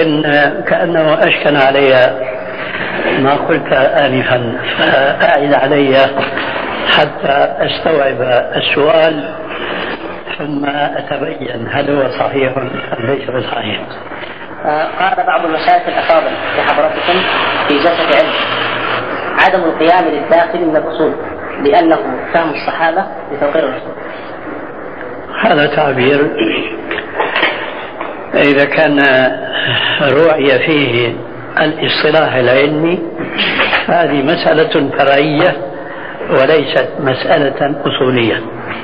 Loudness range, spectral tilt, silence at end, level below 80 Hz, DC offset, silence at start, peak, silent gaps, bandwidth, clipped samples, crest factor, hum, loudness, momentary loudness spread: 5 LU; -7.5 dB/octave; 0 s; -48 dBFS; 2%; 0 s; 0 dBFS; none; 5.6 kHz; under 0.1%; 12 dB; none; -12 LUFS; 12 LU